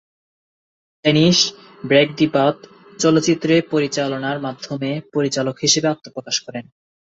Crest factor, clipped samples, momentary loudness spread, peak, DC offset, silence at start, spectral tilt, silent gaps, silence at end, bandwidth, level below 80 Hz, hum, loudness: 18 dB; under 0.1%; 12 LU; -2 dBFS; under 0.1%; 1.05 s; -4 dB/octave; none; 0.5 s; 8 kHz; -58 dBFS; none; -18 LUFS